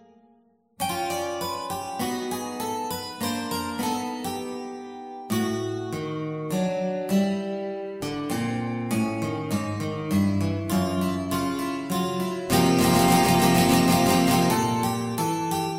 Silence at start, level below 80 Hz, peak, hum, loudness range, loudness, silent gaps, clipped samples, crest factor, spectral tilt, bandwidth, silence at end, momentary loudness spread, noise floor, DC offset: 0.8 s; -52 dBFS; -6 dBFS; none; 9 LU; -25 LUFS; none; under 0.1%; 18 dB; -5 dB/octave; 16 kHz; 0 s; 12 LU; -61 dBFS; under 0.1%